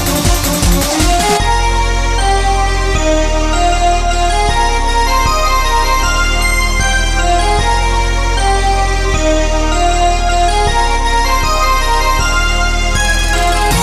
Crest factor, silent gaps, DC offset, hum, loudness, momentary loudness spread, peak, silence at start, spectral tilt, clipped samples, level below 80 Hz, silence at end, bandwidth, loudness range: 12 dB; none; under 0.1%; none; -13 LUFS; 2 LU; 0 dBFS; 0 s; -3.5 dB/octave; under 0.1%; -14 dBFS; 0 s; 15 kHz; 1 LU